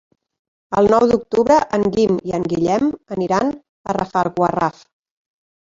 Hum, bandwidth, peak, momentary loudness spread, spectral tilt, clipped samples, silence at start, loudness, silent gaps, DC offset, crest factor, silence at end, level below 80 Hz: none; 7.8 kHz; -2 dBFS; 9 LU; -6.5 dB/octave; under 0.1%; 0.7 s; -18 LUFS; 3.69-3.84 s; under 0.1%; 16 dB; 1.05 s; -50 dBFS